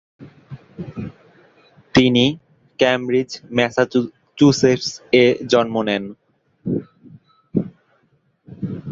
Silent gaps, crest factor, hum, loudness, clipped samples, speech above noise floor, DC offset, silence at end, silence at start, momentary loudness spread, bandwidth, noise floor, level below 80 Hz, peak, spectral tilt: none; 20 dB; none; -18 LUFS; under 0.1%; 45 dB; under 0.1%; 0 s; 0.2 s; 19 LU; 7.8 kHz; -62 dBFS; -52 dBFS; -2 dBFS; -5.5 dB/octave